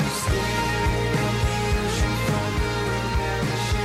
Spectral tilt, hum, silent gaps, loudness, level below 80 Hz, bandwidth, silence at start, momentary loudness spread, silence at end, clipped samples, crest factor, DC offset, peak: -5 dB/octave; none; none; -24 LUFS; -30 dBFS; 16 kHz; 0 s; 2 LU; 0 s; under 0.1%; 12 dB; 0.1%; -10 dBFS